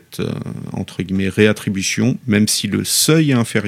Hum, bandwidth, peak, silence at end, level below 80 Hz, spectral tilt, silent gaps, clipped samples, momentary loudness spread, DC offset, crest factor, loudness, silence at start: none; 16.5 kHz; 0 dBFS; 0 s; -54 dBFS; -4.5 dB/octave; none; under 0.1%; 13 LU; under 0.1%; 16 dB; -17 LUFS; 0.1 s